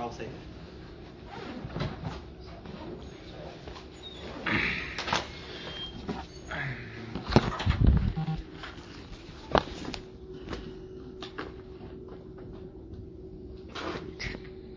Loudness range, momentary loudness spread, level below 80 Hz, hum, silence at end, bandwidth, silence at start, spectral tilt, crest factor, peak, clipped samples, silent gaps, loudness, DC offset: 12 LU; 18 LU; -40 dBFS; none; 0 s; 7.6 kHz; 0 s; -6 dB/octave; 32 dB; -2 dBFS; under 0.1%; none; -34 LUFS; under 0.1%